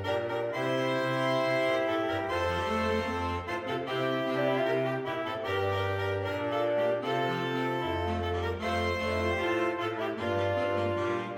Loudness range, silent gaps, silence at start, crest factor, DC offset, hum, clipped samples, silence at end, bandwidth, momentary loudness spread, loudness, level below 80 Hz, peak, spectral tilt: 1 LU; none; 0 s; 14 dB; under 0.1%; none; under 0.1%; 0 s; 17 kHz; 4 LU; -30 LUFS; -54 dBFS; -16 dBFS; -6 dB/octave